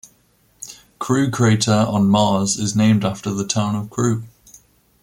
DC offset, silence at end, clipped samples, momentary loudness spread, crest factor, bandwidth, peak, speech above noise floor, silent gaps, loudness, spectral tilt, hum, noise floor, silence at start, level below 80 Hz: under 0.1%; 0.75 s; under 0.1%; 16 LU; 16 dB; 16 kHz; -4 dBFS; 41 dB; none; -18 LUFS; -5 dB/octave; none; -58 dBFS; 0.6 s; -52 dBFS